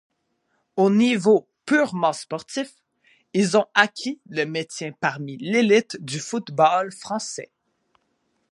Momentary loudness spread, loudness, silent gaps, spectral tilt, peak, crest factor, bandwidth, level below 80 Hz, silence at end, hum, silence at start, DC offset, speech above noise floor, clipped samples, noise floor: 13 LU; -22 LUFS; none; -4.5 dB/octave; 0 dBFS; 22 dB; 11.5 kHz; -74 dBFS; 1.05 s; none; 0.75 s; under 0.1%; 50 dB; under 0.1%; -71 dBFS